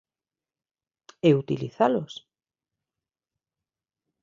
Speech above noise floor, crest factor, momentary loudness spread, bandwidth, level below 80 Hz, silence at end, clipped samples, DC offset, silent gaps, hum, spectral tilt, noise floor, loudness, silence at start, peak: over 67 dB; 22 dB; 16 LU; 7.6 kHz; -70 dBFS; 2.1 s; under 0.1%; under 0.1%; none; none; -7.5 dB/octave; under -90 dBFS; -24 LUFS; 1.25 s; -8 dBFS